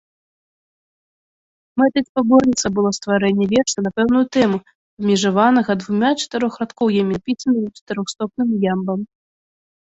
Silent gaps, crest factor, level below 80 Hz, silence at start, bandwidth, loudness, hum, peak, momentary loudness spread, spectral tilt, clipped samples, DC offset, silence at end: 2.09-2.15 s, 4.75-4.97 s, 7.81-7.87 s; 16 dB; -54 dBFS; 1.75 s; 8 kHz; -18 LUFS; none; -2 dBFS; 10 LU; -5 dB/octave; under 0.1%; under 0.1%; 0.75 s